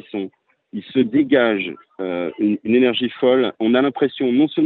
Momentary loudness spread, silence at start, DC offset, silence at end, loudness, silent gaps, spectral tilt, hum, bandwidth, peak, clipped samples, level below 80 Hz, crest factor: 13 LU; 0.15 s; under 0.1%; 0 s; -19 LUFS; none; -9 dB/octave; none; 4.3 kHz; -4 dBFS; under 0.1%; -64 dBFS; 16 dB